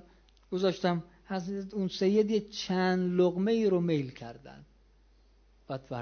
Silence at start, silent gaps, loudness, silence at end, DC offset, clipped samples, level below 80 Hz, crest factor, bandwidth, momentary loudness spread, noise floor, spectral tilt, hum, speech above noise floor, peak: 0.5 s; none; -30 LUFS; 0 s; under 0.1%; under 0.1%; -62 dBFS; 16 dB; 6.8 kHz; 14 LU; -62 dBFS; -6.5 dB/octave; none; 33 dB; -14 dBFS